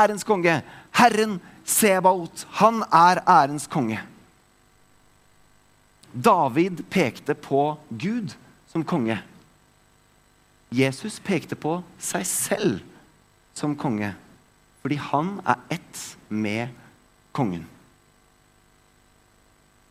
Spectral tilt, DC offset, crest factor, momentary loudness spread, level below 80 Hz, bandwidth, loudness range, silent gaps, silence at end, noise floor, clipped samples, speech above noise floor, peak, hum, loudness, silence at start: -4.5 dB/octave; under 0.1%; 24 dB; 15 LU; -64 dBFS; 16 kHz; 10 LU; none; 2.25 s; -59 dBFS; under 0.1%; 37 dB; -2 dBFS; 50 Hz at -55 dBFS; -23 LUFS; 0 s